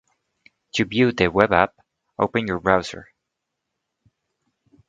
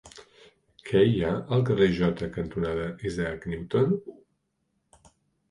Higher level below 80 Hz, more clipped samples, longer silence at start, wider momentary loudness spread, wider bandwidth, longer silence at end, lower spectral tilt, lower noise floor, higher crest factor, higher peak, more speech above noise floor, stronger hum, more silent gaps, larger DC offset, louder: about the same, -50 dBFS vs -50 dBFS; neither; first, 0.75 s vs 0.05 s; first, 14 LU vs 10 LU; second, 9.2 kHz vs 11 kHz; first, 1.85 s vs 1.35 s; second, -5.5 dB/octave vs -7.5 dB/octave; first, -81 dBFS vs -76 dBFS; first, 24 dB vs 18 dB; first, 0 dBFS vs -10 dBFS; first, 61 dB vs 50 dB; neither; neither; neither; first, -21 LUFS vs -26 LUFS